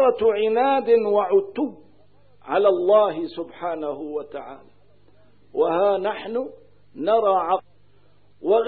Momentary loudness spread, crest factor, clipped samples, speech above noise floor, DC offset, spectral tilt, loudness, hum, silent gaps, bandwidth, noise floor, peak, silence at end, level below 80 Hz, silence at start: 13 LU; 16 dB; under 0.1%; 38 dB; 0.3%; -9.5 dB/octave; -22 LUFS; 50 Hz at -65 dBFS; none; 4.7 kHz; -59 dBFS; -6 dBFS; 0 s; -64 dBFS; 0 s